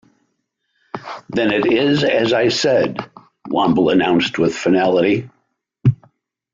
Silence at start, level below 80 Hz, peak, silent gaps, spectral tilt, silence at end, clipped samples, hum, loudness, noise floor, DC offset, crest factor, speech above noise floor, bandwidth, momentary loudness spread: 0.95 s; -52 dBFS; -4 dBFS; none; -6 dB/octave; 0.6 s; under 0.1%; none; -16 LUFS; -71 dBFS; under 0.1%; 14 dB; 55 dB; 7.6 kHz; 16 LU